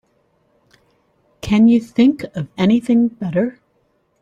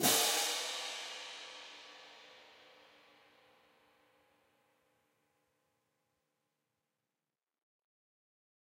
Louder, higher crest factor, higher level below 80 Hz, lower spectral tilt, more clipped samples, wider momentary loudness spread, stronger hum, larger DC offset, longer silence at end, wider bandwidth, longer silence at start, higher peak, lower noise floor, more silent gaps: first, -16 LUFS vs -34 LUFS; second, 16 dB vs 28 dB; first, -48 dBFS vs under -90 dBFS; first, -7.5 dB/octave vs -0.5 dB/octave; neither; second, 12 LU vs 27 LU; neither; neither; second, 0.7 s vs 6.1 s; second, 9.4 kHz vs 16 kHz; first, 1.45 s vs 0 s; first, -4 dBFS vs -14 dBFS; second, -63 dBFS vs under -90 dBFS; neither